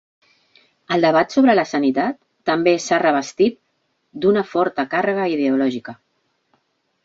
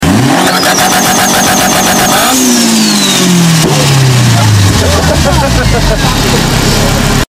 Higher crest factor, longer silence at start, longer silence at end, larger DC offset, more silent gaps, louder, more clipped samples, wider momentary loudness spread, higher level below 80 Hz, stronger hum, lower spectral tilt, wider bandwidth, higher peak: first, 18 dB vs 8 dB; first, 0.9 s vs 0 s; first, 1.1 s vs 0.05 s; neither; neither; second, -18 LUFS vs -7 LUFS; second, under 0.1% vs 0.4%; first, 8 LU vs 2 LU; second, -64 dBFS vs -20 dBFS; neither; first, -5 dB/octave vs -3.5 dB/octave; second, 8 kHz vs 16.5 kHz; about the same, -2 dBFS vs 0 dBFS